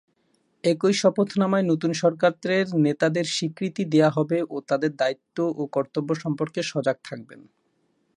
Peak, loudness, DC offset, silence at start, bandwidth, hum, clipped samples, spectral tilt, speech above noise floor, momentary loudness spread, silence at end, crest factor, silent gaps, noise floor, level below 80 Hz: -6 dBFS; -24 LUFS; under 0.1%; 0.65 s; 11.5 kHz; none; under 0.1%; -5.5 dB/octave; 46 dB; 7 LU; 0.75 s; 18 dB; none; -69 dBFS; -72 dBFS